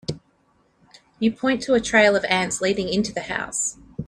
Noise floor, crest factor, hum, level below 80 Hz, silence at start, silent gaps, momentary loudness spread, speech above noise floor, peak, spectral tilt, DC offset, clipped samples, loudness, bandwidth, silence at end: -63 dBFS; 20 dB; none; -52 dBFS; 0.1 s; none; 10 LU; 42 dB; -2 dBFS; -3.5 dB/octave; under 0.1%; under 0.1%; -21 LUFS; 14 kHz; 0 s